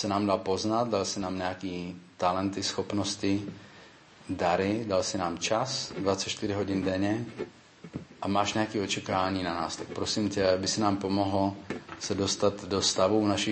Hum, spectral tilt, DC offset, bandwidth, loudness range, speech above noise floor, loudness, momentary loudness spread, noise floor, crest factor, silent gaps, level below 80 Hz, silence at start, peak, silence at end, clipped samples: none; -4 dB/octave; under 0.1%; 8.8 kHz; 3 LU; 24 dB; -29 LUFS; 12 LU; -53 dBFS; 18 dB; none; -62 dBFS; 0 s; -12 dBFS; 0 s; under 0.1%